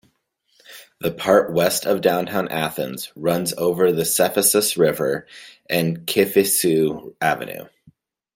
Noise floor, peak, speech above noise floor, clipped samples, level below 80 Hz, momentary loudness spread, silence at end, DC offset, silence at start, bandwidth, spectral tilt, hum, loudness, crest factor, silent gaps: -66 dBFS; -2 dBFS; 46 dB; under 0.1%; -60 dBFS; 11 LU; 0.7 s; under 0.1%; 0.7 s; 17 kHz; -3.5 dB/octave; none; -20 LUFS; 20 dB; none